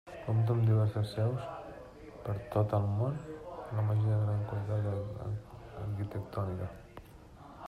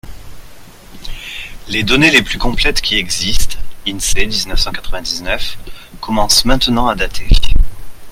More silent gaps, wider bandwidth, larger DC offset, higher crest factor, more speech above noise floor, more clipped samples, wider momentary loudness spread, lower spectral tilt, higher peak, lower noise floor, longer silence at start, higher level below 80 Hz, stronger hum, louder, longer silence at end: neither; second, 4.9 kHz vs 16 kHz; neither; about the same, 16 dB vs 12 dB; about the same, 21 dB vs 24 dB; neither; about the same, 19 LU vs 17 LU; first, -9 dB/octave vs -3 dB/octave; second, -18 dBFS vs 0 dBFS; first, -53 dBFS vs -35 dBFS; about the same, 0.05 s vs 0.05 s; second, -58 dBFS vs -20 dBFS; neither; second, -34 LUFS vs -14 LUFS; about the same, 0 s vs 0 s